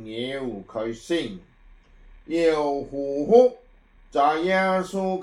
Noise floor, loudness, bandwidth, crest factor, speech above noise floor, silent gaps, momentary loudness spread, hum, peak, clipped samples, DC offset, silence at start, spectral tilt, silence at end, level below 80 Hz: -53 dBFS; -23 LUFS; 11.5 kHz; 20 dB; 31 dB; none; 14 LU; none; -4 dBFS; under 0.1%; under 0.1%; 0 s; -5.5 dB/octave; 0 s; -52 dBFS